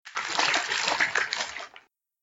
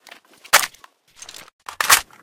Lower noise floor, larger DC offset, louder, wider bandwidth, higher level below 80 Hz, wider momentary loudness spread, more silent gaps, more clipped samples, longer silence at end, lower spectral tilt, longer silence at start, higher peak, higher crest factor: first, -56 dBFS vs -51 dBFS; neither; second, -26 LUFS vs -17 LUFS; about the same, 16.5 kHz vs 18 kHz; second, -70 dBFS vs -56 dBFS; second, 12 LU vs 23 LU; second, none vs 1.53-1.59 s; neither; first, 0.45 s vs 0.2 s; first, 0.5 dB/octave vs 2 dB/octave; second, 0.05 s vs 0.55 s; second, -6 dBFS vs 0 dBFS; about the same, 22 dB vs 22 dB